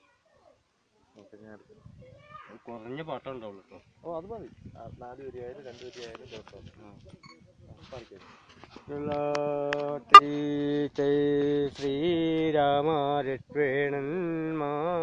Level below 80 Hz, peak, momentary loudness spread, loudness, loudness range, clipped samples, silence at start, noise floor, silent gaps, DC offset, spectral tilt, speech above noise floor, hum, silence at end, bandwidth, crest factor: -62 dBFS; 0 dBFS; 21 LU; -25 LUFS; 23 LU; under 0.1%; 1.45 s; -69 dBFS; none; under 0.1%; -5.5 dB/octave; 41 dB; none; 0 s; 9.8 kHz; 28 dB